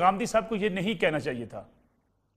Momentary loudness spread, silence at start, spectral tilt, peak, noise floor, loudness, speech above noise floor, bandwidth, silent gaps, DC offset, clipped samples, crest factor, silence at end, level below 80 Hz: 14 LU; 0 s; -5 dB/octave; -10 dBFS; -71 dBFS; -28 LUFS; 44 dB; 15 kHz; none; under 0.1%; under 0.1%; 20 dB; 0.7 s; -58 dBFS